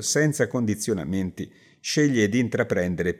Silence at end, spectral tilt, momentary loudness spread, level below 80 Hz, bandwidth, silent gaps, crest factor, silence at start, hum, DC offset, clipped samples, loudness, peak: 0 s; -5 dB/octave; 12 LU; -60 dBFS; 16 kHz; none; 18 dB; 0 s; none; under 0.1%; under 0.1%; -24 LUFS; -6 dBFS